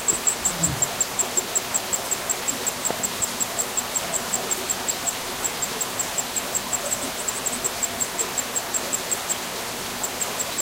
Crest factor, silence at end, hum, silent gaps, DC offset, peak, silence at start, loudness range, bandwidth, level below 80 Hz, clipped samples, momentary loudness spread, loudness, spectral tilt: 20 dB; 0 s; none; none; under 0.1%; -6 dBFS; 0 s; 2 LU; 16 kHz; -52 dBFS; under 0.1%; 4 LU; -24 LUFS; -1 dB/octave